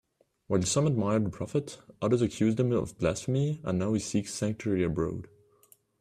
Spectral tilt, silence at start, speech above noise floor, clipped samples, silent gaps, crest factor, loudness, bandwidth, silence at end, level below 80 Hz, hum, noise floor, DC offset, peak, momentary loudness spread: -6 dB/octave; 0.5 s; 35 dB; under 0.1%; none; 18 dB; -29 LUFS; 14.5 kHz; 0.75 s; -56 dBFS; none; -63 dBFS; under 0.1%; -12 dBFS; 7 LU